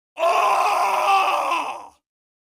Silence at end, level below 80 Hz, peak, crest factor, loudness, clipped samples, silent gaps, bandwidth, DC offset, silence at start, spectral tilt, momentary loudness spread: 0.55 s; -74 dBFS; -8 dBFS; 14 dB; -19 LUFS; under 0.1%; none; 15.5 kHz; under 0.1%; 0.15 s; 0 dB/octave; 9 LU